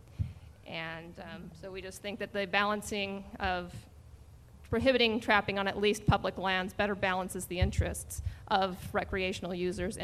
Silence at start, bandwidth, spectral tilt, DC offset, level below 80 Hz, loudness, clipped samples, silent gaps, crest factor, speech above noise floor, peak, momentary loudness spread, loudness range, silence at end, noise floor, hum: 0.05 s; 15.5 kHz; -4.5 dB/octave; under 0.1%; -46 dBFS; -32 LUFS; under 0.1%; none; 22 dB; 21 dB; -10 dBFS; 16 LU; 6 LU; 0 s; -54 dBFS; none